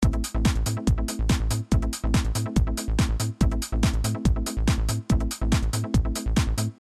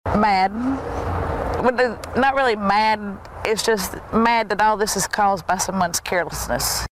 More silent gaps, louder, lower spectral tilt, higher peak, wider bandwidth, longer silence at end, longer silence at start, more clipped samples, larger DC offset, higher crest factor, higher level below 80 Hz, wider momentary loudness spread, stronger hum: neither; second, -25 LUFS vs -20 LUFS; first, -5.5 dB/octave vs -3.5 dB/octave; second, -8 dBFS vs -4 dBFS; second, 14 kHz vs 16 kHz; about the same, 0.05 s vs 0.05 s; about the same, 0 s vs 0.05 s; neither; neither; about the same, 14 dB vs 18 dB; first, -26 dBFS vs -38 dBFS; second, 1 LU vs 7 LU; neither